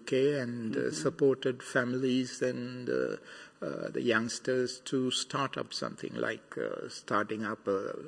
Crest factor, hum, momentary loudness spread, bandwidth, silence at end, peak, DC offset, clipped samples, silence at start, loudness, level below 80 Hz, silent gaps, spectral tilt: 18 dB; none; 9 LU; 10.5 kHz; 0 s; -14 dBFS; under 0.1%; under 0.1%; 0 s; -33 LUFS; -76 dBFS; none; -4.5 dB/octave